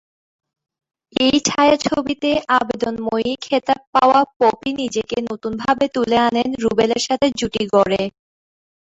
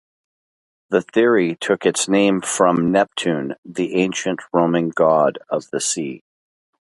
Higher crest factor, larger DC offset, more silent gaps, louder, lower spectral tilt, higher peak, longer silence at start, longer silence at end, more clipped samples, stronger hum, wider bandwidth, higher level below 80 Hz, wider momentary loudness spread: about the same, 16 dB vs 18 dB; neither; about the same, 3.87-3.93 s, 4.36-4.40 s vs 3.58-3.63 s; about the same, -18 LUFS vs -19 LUFS; about the same, -3.5 dB/octave vs -4.5 dB/octave; about the same, -2 dBFS vs 0 dBFS; first, 1.2 s vs 0.9 s; first, 0.9 s vs 0.7 s; neither; neither; second, 8.2 kHz vs 11.5 kHz; first, -52 dBFS vs -62 dBFS; about the same, 8 LU vs 9 LU